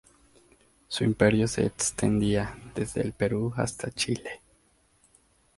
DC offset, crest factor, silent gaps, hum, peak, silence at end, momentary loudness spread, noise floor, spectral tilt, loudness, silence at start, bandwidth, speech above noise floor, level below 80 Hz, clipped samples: under 0.1%; 24 dB; none; none; -6 dBFS; 1.2 s; 12 LU; -65 dBFS; -5 dB/octave; -27 LUFS; 0.9 s; 11.5 kHz; 38 dB; -50 dBFS; under 0.1%